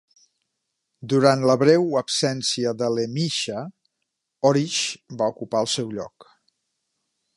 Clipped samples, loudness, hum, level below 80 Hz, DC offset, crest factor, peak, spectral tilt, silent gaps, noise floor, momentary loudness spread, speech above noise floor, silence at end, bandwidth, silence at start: under 0.1%; -22 LUFS; none; -70 dBFS; under 0.1%; 22 dB; -2 dBFS; -4.5 dB/octave; none; -79 dBFS; 14 LU; 58 dB; 1.15 s; 11.5 kHz; 1 s